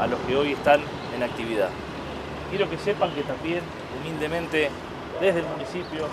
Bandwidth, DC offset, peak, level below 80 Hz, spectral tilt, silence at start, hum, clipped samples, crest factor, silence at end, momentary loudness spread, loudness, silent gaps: 14 kHz; under 0.1%; -4 dBFS; -48 dBFS; -5.5 dB/octave; 0 s; none; under 0.1%; 22 dB; 0 s; 12 LU; -26 LUFS; none